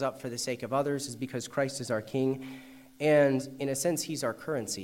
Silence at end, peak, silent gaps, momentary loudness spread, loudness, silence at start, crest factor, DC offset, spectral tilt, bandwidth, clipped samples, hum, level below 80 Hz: 0 s; -12 dBFS; none; 11 LU; -31 LUFS; 0 s; 18 dB; under 0.1%; -4.5 dB/octave; 16 kHz; under 0.1%; none; -70 dBFS